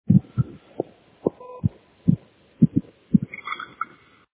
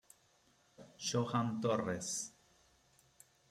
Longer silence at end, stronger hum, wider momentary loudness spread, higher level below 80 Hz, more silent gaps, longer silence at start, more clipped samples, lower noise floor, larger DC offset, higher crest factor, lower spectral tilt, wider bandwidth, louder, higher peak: second, 0.5 s vs 1.2 s; neither; first, 13 LU vs 10 LU; first, -48 dBFS vs -76 dBFS; neither; second, 0.1 s vs 0.8 s; neither; second, -44 dBFS vs -71 dBFS; neither; about the same, 22 dB vs 20 dB; first, -12.5 dB/octave vs -4.5 dB/octave; second, 4 kHz vs 15.5 kHz; first, -26 LUFS vs -38 LUFS; first, -2 dBFS vs -22 dBFS